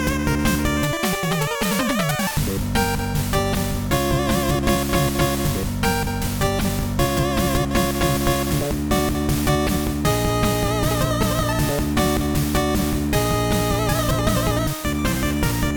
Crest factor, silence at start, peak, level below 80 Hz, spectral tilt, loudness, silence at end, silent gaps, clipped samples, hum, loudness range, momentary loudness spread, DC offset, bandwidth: 16 dB; 0 s; -4 dBFS; -28 dBFS; -5 dB/octave; -21 LUFS; 0 s; none; under 0.1%; none; 1 LU; 2 LU; under 0.1%; 19.5 kHz